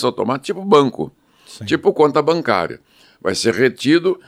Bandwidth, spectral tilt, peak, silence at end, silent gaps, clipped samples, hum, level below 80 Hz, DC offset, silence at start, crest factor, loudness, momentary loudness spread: 14.5 kHz; -5 dB/octave; 0 dBFS; 0.1 s; none; under 0.1%; none; -60 dBFS; under 0.1%; 0 s; 16 dB; -17 LUFS; 14 LU